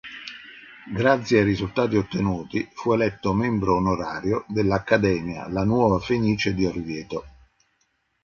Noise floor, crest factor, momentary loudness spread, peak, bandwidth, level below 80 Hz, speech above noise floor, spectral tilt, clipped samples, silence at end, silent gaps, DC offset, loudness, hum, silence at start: -70 dBFS; 20 dB; 14 LU; -4 dBFS; 7.2 kHz; -46 dBFS; 48 dB; -7 dB/octave; under 0.1%; 0.95 s; none; under 0.1%; -23 LUFS; none; 0.05 s